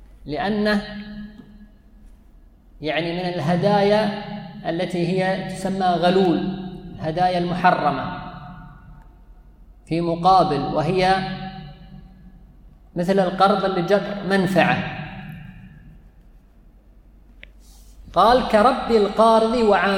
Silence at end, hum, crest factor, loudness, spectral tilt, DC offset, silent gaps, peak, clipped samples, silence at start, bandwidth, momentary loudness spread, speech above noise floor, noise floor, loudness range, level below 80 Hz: 0 s; none; 20 dB; -20 LUFS; -6.5 dB/octave; under 0.1%; none; -2 dBFS; under 0.1%; 0 s; 15.5 kHz; 19 LU; 31 dB; -50 dBFS; 5 LU; -46 dBFS